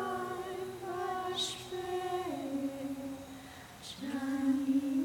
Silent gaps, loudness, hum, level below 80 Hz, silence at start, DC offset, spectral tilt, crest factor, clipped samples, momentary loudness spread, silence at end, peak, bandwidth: none; -36 LUFS; none; -68 dBFS; 0 s; under 0.1%; -4 dB/octave; 14 dB; under 0.1%; 14 LU; 0 s; -22 dBFS; 18 kHz